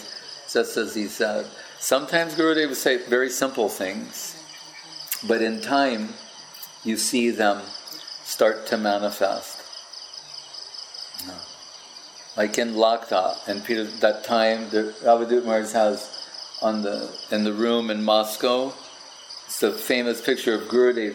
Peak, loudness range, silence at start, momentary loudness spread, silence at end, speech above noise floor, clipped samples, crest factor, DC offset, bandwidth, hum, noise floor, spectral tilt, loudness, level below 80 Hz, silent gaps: -4 dBFS; 5 LU; 0 s; 16 LU; 0 s; 20 dB; under 0.1%; 20 dB; under 0.1%; 17.5 kHz; none; -43 dBFS; -3 dB/octave; -23 LUFS; -76 dBFS; none